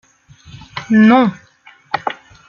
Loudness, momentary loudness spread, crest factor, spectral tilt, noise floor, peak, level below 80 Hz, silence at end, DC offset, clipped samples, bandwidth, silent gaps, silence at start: -14 LUFS; 19 LU; 14 dB; -7 dB/octave; -44 dBFS; -2 dBFS; -54 dBFS; 0.35 s; under 0.1%; under 0.1%; 7 kHz; none; 0.75 s